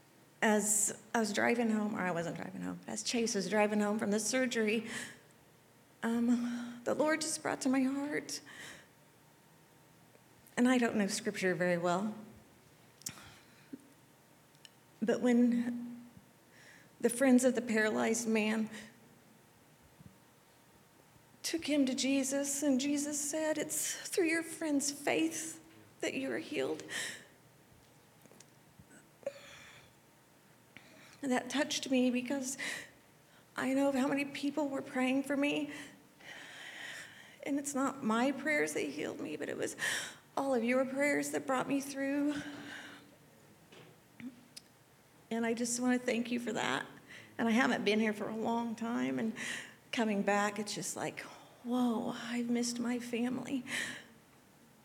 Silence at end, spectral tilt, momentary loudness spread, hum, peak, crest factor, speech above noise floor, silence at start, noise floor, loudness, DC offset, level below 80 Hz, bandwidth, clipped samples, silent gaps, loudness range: 0.8 s; -3.5 dB/octave; 17 LU; none; -16 dBFS; 20 dB; 30 dB; 0.4 s; -64 dBFS; -34 LUFS; under 0.1%; -80 dBFS; 17.5 kHz; under 0.1%; none; 8 LU